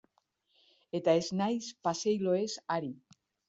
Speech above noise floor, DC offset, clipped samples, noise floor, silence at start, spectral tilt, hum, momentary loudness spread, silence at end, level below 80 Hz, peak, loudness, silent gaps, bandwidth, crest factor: 44 dB; under 0.1%; under 0.1%; -76 dBFS; 0.95 s; -5 dB/octave; none; 10 LU; 0.55 s; -76 dBFS; -14 dBFS; -32 LUFS; none; 8 kHz; 20 dB